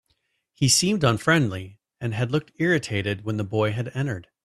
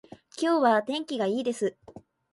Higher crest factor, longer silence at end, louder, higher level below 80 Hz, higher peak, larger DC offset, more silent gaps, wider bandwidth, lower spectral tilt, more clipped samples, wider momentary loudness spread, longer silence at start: about the same, 18 dB vs 18 dB; about the same, 0.25 s vs 0.35 s; first, -23 LUFS vs -27 LUFS; first, -56 dBFS vs -72 dBFS; first, -6 dBFS vs -10 dBFS; neither; neither; first, 14 kHz vs 11.5 kHz; about the same, -4.5 dB/octave vs -4.5 dB/octave; neither; about the same, 11 LU vs 9 LU; first, 0.6 s vs 0.35 s